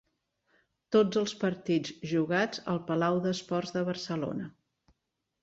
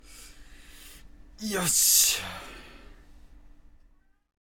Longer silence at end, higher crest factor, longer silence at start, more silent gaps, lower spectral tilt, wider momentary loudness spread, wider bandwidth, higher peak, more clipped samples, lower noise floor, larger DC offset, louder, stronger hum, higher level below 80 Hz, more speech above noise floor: second, 0.95 s vs 1.15 s; second, 18 dB vs 24 dB; first, 0.9 s vs 0.1 s; neither; first, -6 dB/octave vs -0.5 dB/octave; second, 7 LU vs 22 LU; second, 8 kHz vs 18 kHz; second, -14 dBFS vs -8 dBFS; neither; first, -84 dBFS vs -60 dBFS; neither; second, -30 LUFS vs -21 LUFS; neither; second, -70 dBFS vs -52 dBFS; first, 54 dB vs 36 dB